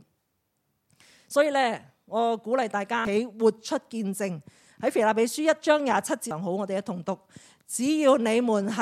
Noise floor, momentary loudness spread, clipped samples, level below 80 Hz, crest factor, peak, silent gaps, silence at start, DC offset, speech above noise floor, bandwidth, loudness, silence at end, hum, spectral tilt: -76 dBFS; 10 LU; under 0.1%; -72 dBFS; 18 dB; -8 dBFS; none; 1.3 s; under 0.1%; 50 dB; 15.5 kHz; -26 LUFS; 0 s; none; -4.5 dB/octave